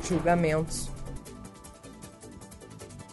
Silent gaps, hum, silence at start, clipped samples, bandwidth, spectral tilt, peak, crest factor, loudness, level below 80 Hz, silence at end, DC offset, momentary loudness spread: none; none; 0 s; under 0.1%; 11.5 kHz; -5.5 dB/octave; -10 dBFS; 20 dB; -28 LUFS; -44 dBFS; 0 s; under 0.1%; 22 LU